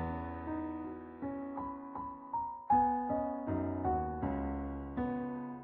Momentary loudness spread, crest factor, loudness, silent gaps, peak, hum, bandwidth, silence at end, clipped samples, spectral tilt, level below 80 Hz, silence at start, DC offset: 12 LU; 18 dB; -37 LUFS; none; -18 dBFS; none; 4.1 kHz; 0 s; under 0.1%; -8.5 dB/octave; -50 dBFS; 0 s; under 0.1%